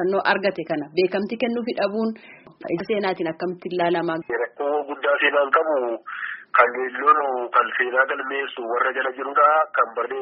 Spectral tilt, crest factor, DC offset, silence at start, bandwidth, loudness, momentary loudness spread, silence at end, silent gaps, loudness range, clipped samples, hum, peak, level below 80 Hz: -2.5 dB/octave; 20 dB; under 0.1%; 0 s; 5.6 kHz; -22 LUFS; 10 LU; 0 s; none; 5 LU; under 0.1%; none; -2 dBFS; -70 dBFS